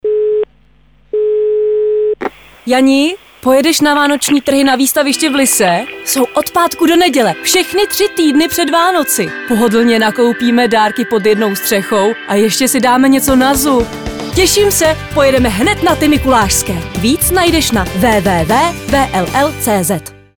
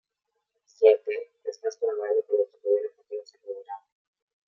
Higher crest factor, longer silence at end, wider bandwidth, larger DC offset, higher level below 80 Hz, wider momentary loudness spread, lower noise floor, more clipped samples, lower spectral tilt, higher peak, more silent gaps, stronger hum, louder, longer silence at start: second, 12 dB vs 22 dB; second, 0.3 s vs 0.7 s; first, over 20 kHz vs 7 kHz; neither; first, -32 dBFS vs under -90 dBFS; second, 6 LU vs 19 LU; second, -49 dBFS vs -81 dBFS; neither; first, -3.5 dB/octave vs -2 dB/octave; first, 0 dBFS vs -6 dBFS; neither; neither; first, -11 LUFS vs -26 LUFS; second, 0.05 s vs 0.8 s